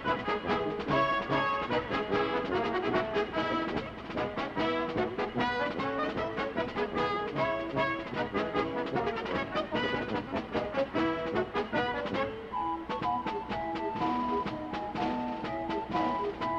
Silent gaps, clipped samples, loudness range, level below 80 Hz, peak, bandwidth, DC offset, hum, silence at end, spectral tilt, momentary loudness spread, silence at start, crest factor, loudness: none; under 0.1%; 3 LU; -54 dBFS; -16 dBFS; 8.8 kHz; under 0.1%; none; 0 s; -6.5 dB/octave; 5 LU; 0 s; 16 dB; -32 LUFS